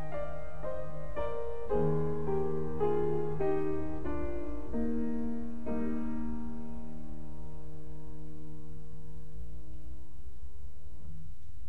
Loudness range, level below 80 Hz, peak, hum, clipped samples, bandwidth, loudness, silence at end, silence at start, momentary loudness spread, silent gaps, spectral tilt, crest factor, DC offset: 16 LU; -48 dBFS; -18 dBFS; none; under 0.1%; 11.5 kHz; -36 LUFS; 0 s; 0 s; 18 LU; none; -9.5 dB/octave; 18 dB; 4%